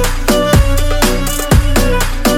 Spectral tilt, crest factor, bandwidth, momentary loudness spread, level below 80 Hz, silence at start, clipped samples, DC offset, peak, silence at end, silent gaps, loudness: -4.5 dB/octave; 10 dB; 17 kHz; 4 LU; -14 dBFS; 0 s; under 0.1%; under 0.1%; 0 dBFS; 0 s; none; -13 LUFS